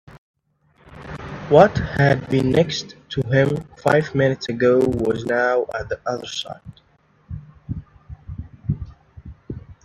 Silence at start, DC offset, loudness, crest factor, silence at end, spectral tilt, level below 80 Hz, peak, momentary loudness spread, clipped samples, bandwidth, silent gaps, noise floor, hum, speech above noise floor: 0.15 s; under 0.1%; -20 LUFS; 22 dB; 0.1 s; -6.5 dB/octave; -44 dBFS; 0 dBFS; 20 LU; under 0.1%; 12 kHz; 0.18-0.34 s; -59 dBFS; none; 40 dB